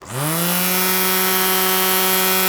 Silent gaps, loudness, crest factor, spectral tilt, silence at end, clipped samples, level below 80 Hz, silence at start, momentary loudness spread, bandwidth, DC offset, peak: none; -15 LUFS; 16 dB; -2.5 dB/octave; 0 s; under 0.1%; -56 dBFS; 0 s; 3 LU; over 20 kHz; under 0.1%; -2 dBFS